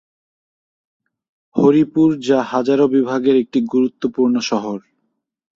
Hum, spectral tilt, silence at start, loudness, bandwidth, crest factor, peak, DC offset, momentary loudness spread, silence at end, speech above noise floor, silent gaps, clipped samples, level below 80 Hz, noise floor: none; -6.5 dB/octave; 1.55 s; -16 LUFS; 7.6 kHz; 16 dB; -2 dBFS; under 0.1%; 8 LU; 0.8 s; 56 dB; none; under 0.1%; -60 dBFS; -72 dBFS